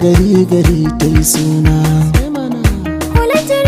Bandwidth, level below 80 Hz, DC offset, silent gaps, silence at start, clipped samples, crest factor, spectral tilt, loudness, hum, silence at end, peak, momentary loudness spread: 16 kHz; -20 dBFS; under 0.1%; none; 0 s; under 0.1%; 10 dB; -6 dB/octave; -12 LUFS; none; 0 s; 0 dBFS; 5 LU